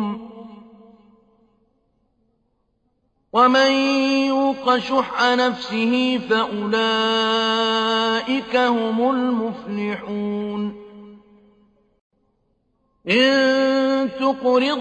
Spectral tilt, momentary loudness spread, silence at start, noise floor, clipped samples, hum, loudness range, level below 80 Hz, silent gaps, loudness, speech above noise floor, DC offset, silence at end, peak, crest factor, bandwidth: -4.5 dB/octave; 11 LU; 0 s; -68 dBFS; under 0.1%; none; 9 LU; -62 dBFS; 12.01-12.10 s; -19 LUFS; 49 dB; under 0.1%; 0 s; -4 dBFS; 16 dB; 8.6 kHz